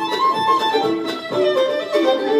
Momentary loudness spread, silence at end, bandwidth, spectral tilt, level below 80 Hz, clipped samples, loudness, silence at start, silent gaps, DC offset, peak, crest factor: 5 LU; 0 s; 15.5 kHz; -4 dB/octave; -68 dBFS; under 0.1%; -18 LUFS; 0 s; none; under 0.1%; -4 dBFS; 14 dB